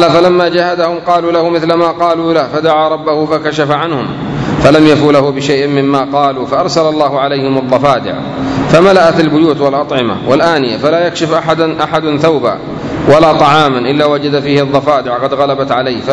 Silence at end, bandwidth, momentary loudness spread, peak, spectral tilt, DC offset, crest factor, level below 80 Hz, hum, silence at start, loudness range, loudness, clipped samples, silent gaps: 0 s; 11 kHz; 7 LU; 0 dBFS; -6 dB/octave; under 0.1%; 10 dB; -40 dBFS; none; 0 s; 2 LU; -10 LUFS; 2%; none